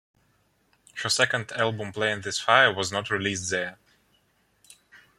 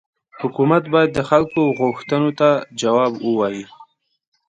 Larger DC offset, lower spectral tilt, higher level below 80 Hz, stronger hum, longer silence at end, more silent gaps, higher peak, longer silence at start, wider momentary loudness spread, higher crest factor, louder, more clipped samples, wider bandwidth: neither; second, -2.5 dB/octave vs -6.5 dB/octave; second, -68 dBFS vs -56 dBFS; neither; second, 0.2 s vs 0.65 s; neither; about the same, -2 dBFS vs 0 dBFS; first, 0.95 s vs 0.35 s; first, 11 LU vs 7 LU; first, 26 dB vs 18 dB; second, -24 LUFS vs -18 LUFS; neither; first, 14.5 kHz vs 9.4 kHz